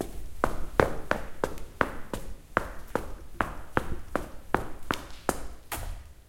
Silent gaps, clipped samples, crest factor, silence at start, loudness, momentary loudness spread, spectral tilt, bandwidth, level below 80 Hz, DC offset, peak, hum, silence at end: none; under 0.1%; 30 dB; 0 s; -33 LUFS; 12 LU; -5 dB/octave; 16.5 kHz; -40 dBFS; under 0.1%; -2 dBFS; none; 0.05 s